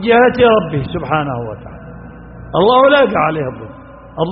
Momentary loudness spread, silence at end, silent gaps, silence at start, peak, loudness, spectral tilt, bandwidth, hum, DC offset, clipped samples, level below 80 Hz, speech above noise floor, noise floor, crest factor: 24 LU; 0 s; none; 0 s; 0 dBFS; -13 LUFS; -4 dB/octave; 5.4 kHz; none; under 0.1%; under 0.1%; -40 dBFS; 20 dB; -33 dBFS; 14 dB